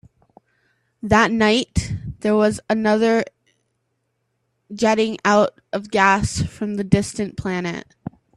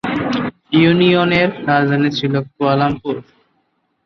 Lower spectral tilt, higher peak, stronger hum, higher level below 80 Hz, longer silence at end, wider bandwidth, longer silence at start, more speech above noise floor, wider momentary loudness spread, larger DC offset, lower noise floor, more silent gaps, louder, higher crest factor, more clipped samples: second, -5 dB/octave vs -7.5 dB/octave; about the same, 0 dBFS vs -2 dBFS; neither; first, -42 dBFS vs -50 dBFS; second, 0.55 s vs 0.85 s; first, 12 kHz vs 6.6 kHz; first, 1.05 s vs 0.05 s; about the same, 53 dB vs 51 dB; first, 13 LU vs 10 LU; neither; first, -72 dBFS vs -65 dBFS; neither; second, -19 LUFS vs -15 LUFS; first, 20 dB vs 14 dB; neither